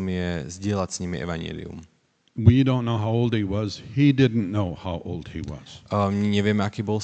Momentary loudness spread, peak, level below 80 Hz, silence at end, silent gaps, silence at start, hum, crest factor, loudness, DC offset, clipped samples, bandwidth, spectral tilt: 16 LU; -4 dBFS; -46 dBFS; 0 s; none; 0 s; none; 20 dB; -24 LUFS; under 0.1%; under 0.1%; 8.8 kHz; -7 dB/octave